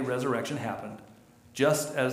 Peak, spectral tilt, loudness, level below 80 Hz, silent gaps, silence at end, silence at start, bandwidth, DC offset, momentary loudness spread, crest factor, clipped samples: -12 dBFS; -4.5 dB/octave; -29 LUFS; -70 dBFS; none; 0 s; 0 s; 16 kHz; under 0.1%; 18 LU; 18 dB; under 0.1%